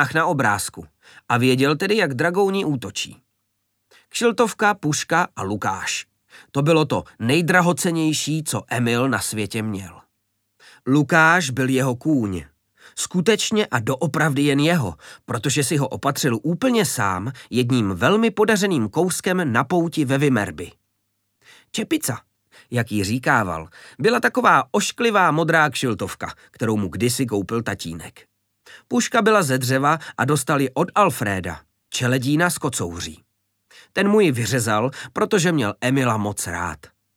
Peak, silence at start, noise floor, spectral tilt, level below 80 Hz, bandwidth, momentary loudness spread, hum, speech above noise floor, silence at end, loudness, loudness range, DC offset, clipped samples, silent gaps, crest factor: -2 dBFS; 0 s; -73 dBFS; -4.5 dB/octave; -56 dBFS; 18 kHz; 12 LU; none; 53 dB; 0.3 s; -20 LUFS; 4 LU; under 0.1%; under 0.1%; none; 20 dB